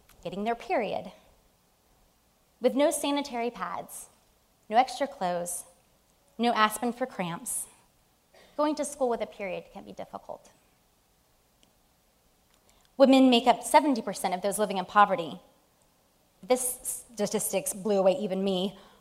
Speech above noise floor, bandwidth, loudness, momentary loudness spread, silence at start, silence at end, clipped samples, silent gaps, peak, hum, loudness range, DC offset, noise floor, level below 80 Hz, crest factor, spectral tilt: 39 dB; 16 kHz; -27 LUFS; 19 LU; 0.25 s; 0.2 s; under 0.1%; none; -6 dBFS; none; 10 LU; under 0.1%; -67 dBFS; -66 dBFS; 24 dB; -3.5 dB/octave